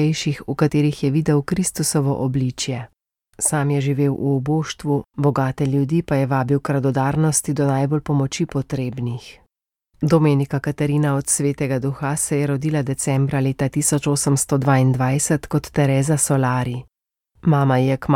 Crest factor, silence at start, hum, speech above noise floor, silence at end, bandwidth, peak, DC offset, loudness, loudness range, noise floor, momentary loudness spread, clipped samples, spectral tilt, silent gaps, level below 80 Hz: 16 dB; 0 s; none; 52 dB; 0 s; 16.5 kHz; -4 dBFS; under 0.1%; -20 LUFS; 3 LU; -71 dBFS; 6 LU; under 0.1%; -5.5 dB/octave; none; -48 dBFS